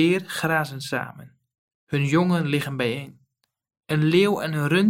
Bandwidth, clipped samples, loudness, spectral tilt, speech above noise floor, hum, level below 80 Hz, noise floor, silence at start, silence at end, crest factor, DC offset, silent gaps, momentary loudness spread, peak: 16.5 kHz; under 0.1%; -23 LUFS; -6 dB/octave; 47 dB; none; -64 dBFS; -70 dBFS; 0 s; 0 s; 16 dB; under 0.1%; 1.58-1.68 s, 1.75-1.87 s; 10 LU; -6 dBFS